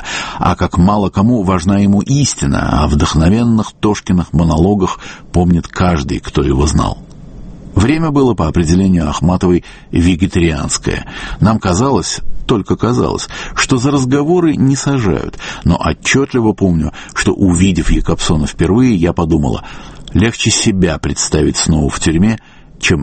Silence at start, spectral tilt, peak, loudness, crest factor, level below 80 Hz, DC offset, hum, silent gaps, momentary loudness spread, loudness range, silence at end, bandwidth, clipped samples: 0 s; -5.5 dB/octave; 0 dBFS; -13 LUFS; 12 dB; -24 dBFS; under 0.1%; none; none; 7 LU; 2 LU; 0 s; 8.8 kHz; under 0.1%